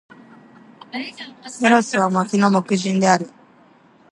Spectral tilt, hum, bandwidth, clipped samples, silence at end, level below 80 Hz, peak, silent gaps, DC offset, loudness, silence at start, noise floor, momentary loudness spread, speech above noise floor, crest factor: -5 dB/octave; none; 11 kHz; under 0.1%; 0.85 s; -68 dBFS; -2 dBFS; none; under 0.1%; -18 LUFS; 0.95 s; -52 dBFS; 17 LU; 33 dB; 20 dB